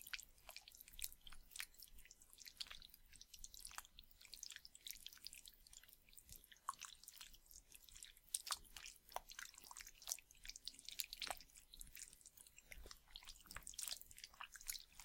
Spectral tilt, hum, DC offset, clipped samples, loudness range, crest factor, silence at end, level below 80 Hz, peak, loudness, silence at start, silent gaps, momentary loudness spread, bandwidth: 1 dB/octave; none; under 0.1%; under 0.1%; 5 LU; 36 dB; 0 s; -68 dBFS; -20 dBFS; -54 LUFS; 0 s; none; 14 LU; 17 kHz